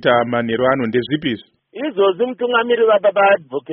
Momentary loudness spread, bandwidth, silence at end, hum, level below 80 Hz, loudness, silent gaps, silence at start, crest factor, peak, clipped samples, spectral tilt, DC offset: 10 LU; 5.4 kHz; 0 s; none; -58 dBFS; -17 LUFS; none; 0 s; 16 dB; -2 dBFS; under 0.1%; -3 dB/octave; under 0.1%